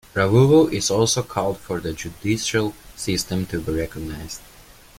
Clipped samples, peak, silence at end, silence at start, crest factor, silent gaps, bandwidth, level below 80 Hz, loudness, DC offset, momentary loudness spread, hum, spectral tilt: under 0.1%; -4 dBFS; 0.35 s; 0.15 s; 18 dB; none; 16.5 kHz; -44 dBFS; -21 LUFS; under 0.1%; 16 LU; none; -5 dB/octave